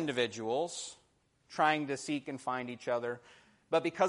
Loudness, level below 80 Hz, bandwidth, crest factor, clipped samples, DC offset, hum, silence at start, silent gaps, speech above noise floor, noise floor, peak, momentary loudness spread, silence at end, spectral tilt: -35 LUFS; -78 dBFS; 11.5 kHz; 22 dB; under 0.1%; under 0.1%; none; 0 s; none; 38 dB; -72 dBFS; -14 dBFS; 12 LU; 0 s; -4 dB/octave